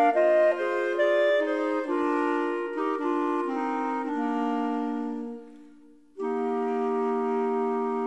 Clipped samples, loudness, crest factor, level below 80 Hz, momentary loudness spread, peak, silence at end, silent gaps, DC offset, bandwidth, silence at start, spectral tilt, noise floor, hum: under 0.1%; -27 LUFS; 14 dB; -74 dBFS; 8 LU; -12 dBFS; 0 s; none; 0.1%; 9.2 kHz; 0 s; -5.5 dB/octave; -54 dBFS; none